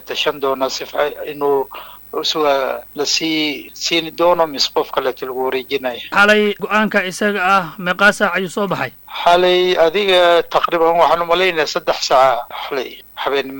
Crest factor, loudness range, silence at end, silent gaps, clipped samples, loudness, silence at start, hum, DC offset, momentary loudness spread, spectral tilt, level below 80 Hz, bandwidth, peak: 16 dB; 5 LU; 0 s; none; under 0.1%; -16 LUFS; 0 s; none; under 0.1%; 10 LU; -3 dB/octave; -50 dBFS; 17.5 kHz; 0 dBFS